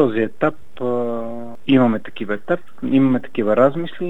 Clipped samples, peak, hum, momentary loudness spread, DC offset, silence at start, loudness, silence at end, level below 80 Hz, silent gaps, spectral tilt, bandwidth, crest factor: under 0.1%; -2 dBFS; none; 11 LU; 4%; 0 s; -19 LUFS; 0 s; -62 dBFS; none; -8.5 dB/octave; 4 kHz; 16 dB